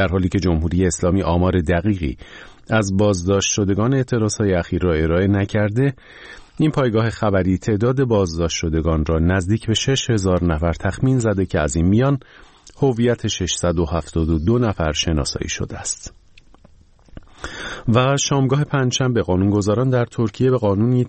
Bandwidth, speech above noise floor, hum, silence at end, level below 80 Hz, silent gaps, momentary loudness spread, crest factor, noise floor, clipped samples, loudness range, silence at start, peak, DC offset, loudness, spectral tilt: 8.8 kHz; 31 dB; none; 0 s; -34 dBFS; none; 7 LU; 16 dB; -49 dBFS; under 0.1%; 4 LU; 0 s; -2 dBFS; under 0.1%; -19 LUFS; -5.5 dB/octave